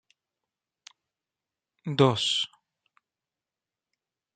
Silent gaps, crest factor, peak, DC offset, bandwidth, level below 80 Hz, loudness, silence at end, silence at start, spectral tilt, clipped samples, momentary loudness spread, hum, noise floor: none; 26 dB; -6 dBFS; under 0.1%; 9.4 kHz; -72 dBFS; -25 LUFS; 1.9 s; 1.85 s; -5 dB/octave; under 0.1%; 13 LU; none; under -90 dBFS